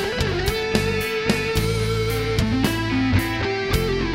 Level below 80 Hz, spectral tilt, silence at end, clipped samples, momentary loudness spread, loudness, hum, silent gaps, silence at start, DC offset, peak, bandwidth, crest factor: -32 dBFS; -5.5 dB/octave; 0 s; under 0.1%; 2 LU; -22 LUFS; none; none; 0 s; under 0.1%; -4 dBFS; 16.5 kHz; 18 dB